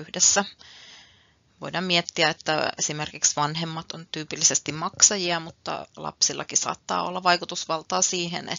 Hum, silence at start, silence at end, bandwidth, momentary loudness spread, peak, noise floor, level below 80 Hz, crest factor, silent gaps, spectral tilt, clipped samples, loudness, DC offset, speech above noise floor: none; 0 s; 0 s; 7.8 kHz; 15 LU; -2 dBFS; -60 dBFS; -66 dBFS; 26 dB; none; -1.5 dB/octave; under 0.1%; -23 LUFS; under 0.1%; 34 dB